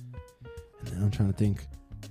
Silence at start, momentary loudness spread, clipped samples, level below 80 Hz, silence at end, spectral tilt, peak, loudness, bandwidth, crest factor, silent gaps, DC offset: 0 s; 20 LU; under 0.1%; -46 dBFS; 0 s; -8 dB/octave; -14 dBFS; -30 LUFS; 13.5 kHz; 16 dB; none; under 0.1%